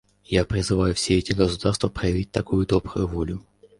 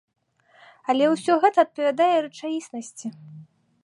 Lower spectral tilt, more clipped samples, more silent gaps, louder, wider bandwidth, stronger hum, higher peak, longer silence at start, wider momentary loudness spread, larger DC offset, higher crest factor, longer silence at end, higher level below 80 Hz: about the same, -5.5 dB/octave vs -4.5 dB/octave; neither; neither; about the same, -23 LUFS vs -22 LUFS; about the same, 11.5 kHz vs 11.5 kHz; neither; about the same, -4 dBFS vs -6 dBFS; second, 0.3 s vs 0.9 s; second, 6 LU vs 17 LU; neither; about the same, 20 dB vs 18 dB; about the same, 0.4 s vs 0.4 s; first, -36 dBFS vs -82 dBFS